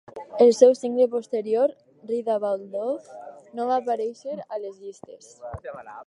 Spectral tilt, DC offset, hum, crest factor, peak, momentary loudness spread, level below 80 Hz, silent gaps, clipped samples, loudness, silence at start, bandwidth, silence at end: -5 dB/octave; under 0.1%; none; 22 dB; -2 dBFS; 22 LU; -62 dBFS; none; under 0.1%; -23 LUFS; 0.15 s; 11 kHz; 0.05 s